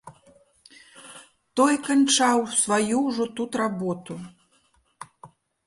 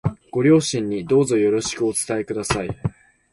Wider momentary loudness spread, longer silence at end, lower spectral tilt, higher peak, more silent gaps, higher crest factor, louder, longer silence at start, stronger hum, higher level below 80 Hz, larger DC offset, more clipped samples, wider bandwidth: first, 25 LU vs 10 LU; about the same, 0.4 s vs 0.45 s; second, -3 dB/octave vs -5 dB/octave; second, -8 dBFS vs -4 dBFS; neither; about the same, 18 dB vs 16 dB; about the same, -23 LUFS vs -21 LUFS; about the same, 0.05 s vs 0.05 s; neither; second, -68 dBFS vs -46 dBFS; neither; neither; about the same, 11.5 kHz vs 12 kHz